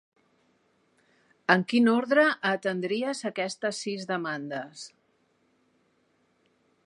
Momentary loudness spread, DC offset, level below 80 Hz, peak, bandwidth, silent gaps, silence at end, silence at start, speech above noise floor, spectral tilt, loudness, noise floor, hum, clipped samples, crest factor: 14 LU; under 0.1%; -82 dBFS; -4 dBFS; 11 kHz; none; 1.95 s; 1.5 s; 43 dB; -5 dB/octave; -27 LUFS; -69 dBFS; none; under 0.1%; 26 dB